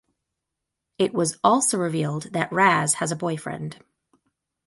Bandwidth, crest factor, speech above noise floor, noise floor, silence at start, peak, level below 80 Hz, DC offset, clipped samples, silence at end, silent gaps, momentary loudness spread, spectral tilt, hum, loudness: 12 kHz; 20 dB; 60 dB; -83 dBFS; 1 s; -4 dBFS; -66 dBFS; under 0.1%; under 0.1%; 0.9 s; none; 12 LU; -4 dB/octave; none; -22 LUFS